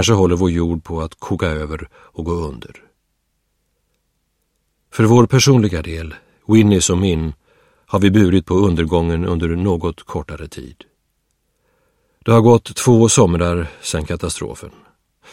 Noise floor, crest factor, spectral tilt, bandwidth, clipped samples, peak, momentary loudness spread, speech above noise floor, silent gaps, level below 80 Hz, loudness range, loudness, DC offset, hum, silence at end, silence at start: -68 dBFS; 18 dB; -5.5 dB/octave; 16 kHz; under 0.1%; 0 dBFS; 18 LU; 53 dB; none; -36 dBFS; 11 LU; -16 LUFS; under 0.1%; none; 0.65 s; 0 s